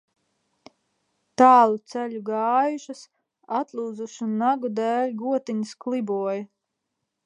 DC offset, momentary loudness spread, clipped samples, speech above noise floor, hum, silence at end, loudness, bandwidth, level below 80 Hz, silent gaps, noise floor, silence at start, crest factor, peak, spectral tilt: under 0.1%; 16 LU; under 0.1%; 58 dB; none; 0.8 s; -23 LUFS; 10.5 kHz; -80 dBFS; none; -80 dBFS; 1.4 s; 22 dB; -2 dBFS; -5.5 dB/octave